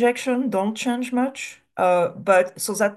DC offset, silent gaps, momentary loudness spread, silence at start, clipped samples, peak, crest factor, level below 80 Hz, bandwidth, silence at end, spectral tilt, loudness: under 0.1%; none; 7 LU; 0 s; under 0.1%; -4 dBFS; 16 dB; -70 dBFS; 12.5 kHz; 0 s; -4 dB/octave; -22 LUFS